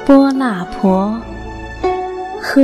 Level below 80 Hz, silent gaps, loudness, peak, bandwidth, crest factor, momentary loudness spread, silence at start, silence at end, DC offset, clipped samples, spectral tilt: -36 dBFS; none; -16 LUFS; 0 dBFS; 13 kHz; 14 dB; 17 LU; 0 s; 0 s; under 0.1%; under 0.1%; -7 dB/octave